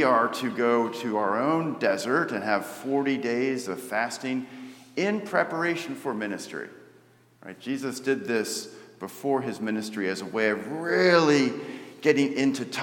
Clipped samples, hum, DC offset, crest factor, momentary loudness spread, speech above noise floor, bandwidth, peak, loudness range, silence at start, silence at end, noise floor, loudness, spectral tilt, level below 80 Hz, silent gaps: under 0.1%; none; under 0.1%; 22 dB; 13 LU; 32 dB; 18 kHz; -6 dBFS; 7 LU; 0 s; 0 s; -58 dBFS; -26 LUFS; -4.5 dB/octave; -82 dBFS; none